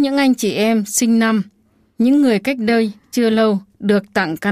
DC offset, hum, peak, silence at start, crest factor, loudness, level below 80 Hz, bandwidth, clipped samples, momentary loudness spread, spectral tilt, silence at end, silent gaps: under 0.1%; none; -4 dBFS; 0 s; 12 dB; -16 LUFS; -60 dBFS; 15.5 kHz; under 0.1%; 6 LU; -4.5 dB/octave; 0 s; none